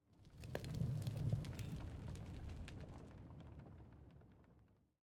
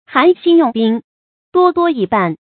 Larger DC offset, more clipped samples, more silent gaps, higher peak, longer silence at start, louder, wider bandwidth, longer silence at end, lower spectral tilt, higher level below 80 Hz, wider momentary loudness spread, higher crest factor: neither; neither; second, none vs 1.04-1.52 s; second, -28 dBFS vs 0 dBFS; about the same, 0.1 s vs 0.1 s; second, -49 LUFS vs -14 LUFS; first, 17.5 kHz vs 4.5 kHz; about the same, 0.3 s vs 0.2 s; second, -7 dB/octave vs -9 dB/octave; about the same, -60 dBFS vs -58 dBFS; first, 20 LU vs 6 LU; first, 22 dB vs 14 dB